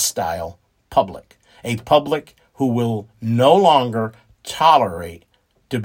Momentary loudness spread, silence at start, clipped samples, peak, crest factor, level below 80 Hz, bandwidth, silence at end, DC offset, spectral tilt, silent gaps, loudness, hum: 18 LU; 0 s; under 0.1%; 0 dBFS; 18 dB; -54 dBFS; 16.5 kHz; 0 s; under 0.1%; -4.5 dB/octave; none; -18 LUFS; none